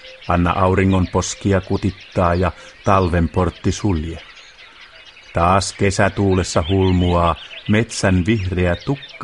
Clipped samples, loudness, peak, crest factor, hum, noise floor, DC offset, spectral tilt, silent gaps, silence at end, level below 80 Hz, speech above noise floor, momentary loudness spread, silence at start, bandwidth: under 0.1%; -18 LUFS; 0 dBFS; 18 dB; none; -42 dBFS; under 0.1%; -6 dB/octave; none; 0 s; -34 dBFS; 25 dB; 7 LU; 0.05 s; 11.5 kHz